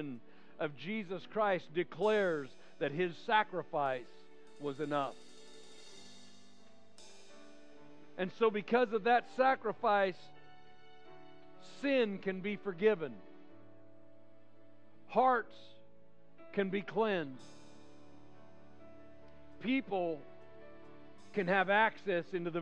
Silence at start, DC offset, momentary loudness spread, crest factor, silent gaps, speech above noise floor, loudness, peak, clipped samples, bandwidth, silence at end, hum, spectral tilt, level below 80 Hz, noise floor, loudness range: 0 s; 0.3%; 24 LU; 22 dB; none; 31 dB; -34 LUFS; -16 dBFS; under 0.1%; 10 kHz; 0 s; none; -6 dB/octave; -82 dBFS; -65 dBFS; 9 LU